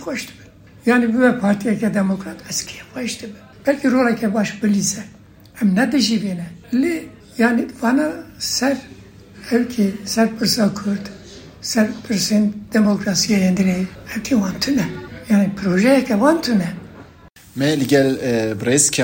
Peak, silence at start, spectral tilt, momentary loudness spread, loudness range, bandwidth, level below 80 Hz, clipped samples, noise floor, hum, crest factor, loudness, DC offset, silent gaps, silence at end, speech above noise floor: 0 dBFS; 0 s; -4.5 dB/octave; 12 LU; 3 LU; 16.5 kHz; -50 dBFS; under 0.1%; -45 dBFS; none; 18 dB; -18 LUFS; under 0.1%; none; 0 s; 27 dB